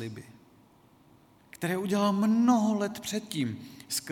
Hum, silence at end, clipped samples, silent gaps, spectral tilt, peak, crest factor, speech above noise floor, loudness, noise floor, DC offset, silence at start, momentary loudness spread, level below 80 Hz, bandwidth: none; 0 s; under 0.1%; none; -5 dB/octave; -14 dBFS; 16 dB; 32 dB; -28 LUFS; -60 dBFS; under 0.1%; 0 s; 15 LU; -70 dBFS; 18 kHz